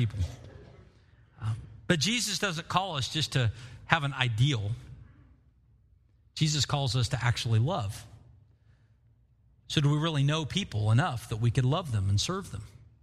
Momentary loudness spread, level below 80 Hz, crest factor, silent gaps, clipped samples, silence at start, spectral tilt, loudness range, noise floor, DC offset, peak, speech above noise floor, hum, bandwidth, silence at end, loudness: 13 LU; -52 dBFS; 26 dB; none; under 0.1%; 0 s; -4.5 dB/octave; 3 LU; -63 dBFS; under 0.1%; -4 dBFS; 35 dB; none; 13.5 kHz; 0.35 s; -29 LUFS